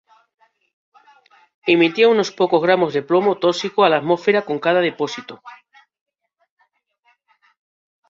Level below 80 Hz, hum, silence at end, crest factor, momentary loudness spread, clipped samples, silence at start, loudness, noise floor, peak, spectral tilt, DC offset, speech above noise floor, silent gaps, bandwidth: -68 dBFS; none; 2.55 s; 18 dB; 11 LU; under 0.1%; 1.65 s; -17 LUFS; -65 dBFS; -2 dBFS; -5 dB/octave; under 0.1%; 48 dB; none; 7.6 kHz